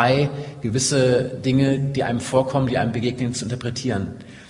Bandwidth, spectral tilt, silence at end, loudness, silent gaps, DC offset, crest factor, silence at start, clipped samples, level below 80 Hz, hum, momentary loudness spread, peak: 11 kHz; -5.5 dB/octave; 0 s; -21 LUFS; none; under 0.1%; 18 dB; 0 s; under 0.1%; -50 dBFS; none; 8 LU; -2 dBFS